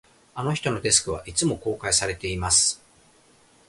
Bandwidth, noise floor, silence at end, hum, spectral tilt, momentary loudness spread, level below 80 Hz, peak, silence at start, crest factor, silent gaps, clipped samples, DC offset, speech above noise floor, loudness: 11.5 kHz; -57 dBFS; 0.9 s; none; -2.5 dB/octave; 11 LU; -46 dBFS; -2 dBFS; 0.35 s; 24 dB; none; under 0.1%; under 0.1%; 33 dB; -22 LUFS